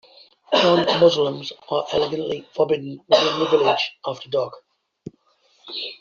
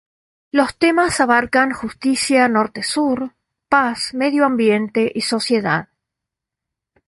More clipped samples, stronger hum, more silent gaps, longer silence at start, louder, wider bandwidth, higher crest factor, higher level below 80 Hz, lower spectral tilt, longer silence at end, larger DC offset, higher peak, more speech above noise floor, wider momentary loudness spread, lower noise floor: neither; neither; neither; about the same, 0.5 s vs 0.55 s; second, -20 LUFS vs -17 LUFS; second, 7.4 kHz vs 11.5 kHz; about the same, 18 dB vs 16 dB; second, -62 dBFS vs -54 dBFS; second, -2.5 dB/octave vs -4 dB/octave; second, 0.05 s vs 1.25 s; neither; about the same, -2 dBFS vs -2 dBFS; second, 41 dB vs 67 dB; first, 14 LU vs 6 LU; second, -61 dBFS vs -83 dBFS